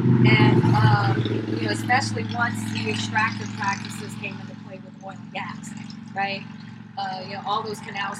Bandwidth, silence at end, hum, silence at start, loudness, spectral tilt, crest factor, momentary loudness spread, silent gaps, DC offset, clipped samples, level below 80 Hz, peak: 12 kHz; 0 s; none; 0 s; -23 LUFS; -6 dB/octave; 18 dB; 20 LU; none; under 0.1%; under 0.1%; -58 dBFS; -4 dBFS